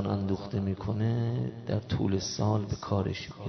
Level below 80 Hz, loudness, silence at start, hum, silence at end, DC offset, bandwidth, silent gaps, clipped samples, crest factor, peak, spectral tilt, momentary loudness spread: -52 dBFS; -31 LUFS; 0 s; none; 0 s; under 0.1%; 6.4 kHz; none; under 0.1%; 16 dB; -14 dBFS; -6.5 dB/octave; 4 LU